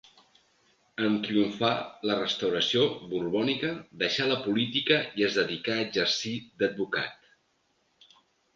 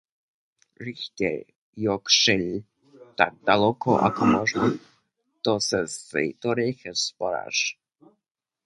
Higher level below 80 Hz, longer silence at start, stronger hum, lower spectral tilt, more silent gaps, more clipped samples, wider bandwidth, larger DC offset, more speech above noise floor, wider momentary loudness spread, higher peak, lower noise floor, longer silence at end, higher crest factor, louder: second, -68 dBFS vs -60 dBFS; first, 1 s vs 0.8 s; neither; about the same, -4.5 dB/octave vs -3.5 dB/octave; second, none vs 1.56-1.73 s; neither; second, 7.6 kHz vs 11.5 kHz; neither; second, 44 dB vs 60 dB; second, 6 LU vs 15 LU; second, -8 dBFS vs -2 dBFS; second, -72 dBFS vs -84 dBFS; first, 1.4 s vs 0.95 s; about the same, 20 dB vs 24 dB; second, -28 LUFS vs -24 LUFS